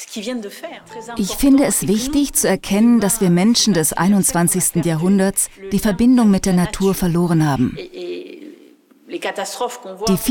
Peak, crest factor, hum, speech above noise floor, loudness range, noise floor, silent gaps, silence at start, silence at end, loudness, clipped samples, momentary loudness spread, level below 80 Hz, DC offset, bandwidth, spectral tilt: -4 dBFS; 14 dB; none; 32 dB; 6 LU; -48 dBFS; none; 0 s; 0 s; -16 LUFS; under 0.1%; 16 LU; -38 dBFS; under 0.1%; 18 kHz; -4.5 dB/octave